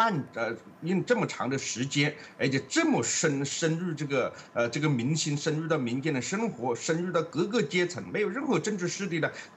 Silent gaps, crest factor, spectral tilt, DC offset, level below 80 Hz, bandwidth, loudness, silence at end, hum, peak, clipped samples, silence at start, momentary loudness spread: none; 18 dB; -4.5 dB/octave; under 0.1%; -74 dBFS; 11.5 kHz; -29 LUFS; 0 s; none; -10 dBFS; under 0.1%; 0 s; 5 LU